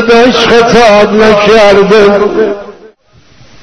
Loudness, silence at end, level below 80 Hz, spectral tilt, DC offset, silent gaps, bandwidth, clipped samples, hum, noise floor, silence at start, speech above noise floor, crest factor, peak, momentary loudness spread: -5 LUFS; 0.75 s; -32 dBFS; -4.5 dB/octave; 4%; none; 11 kHz; 3%; none; -42 dBFS; 0 s; 38 dB; 6 dB; 0 dBFS; 7 LU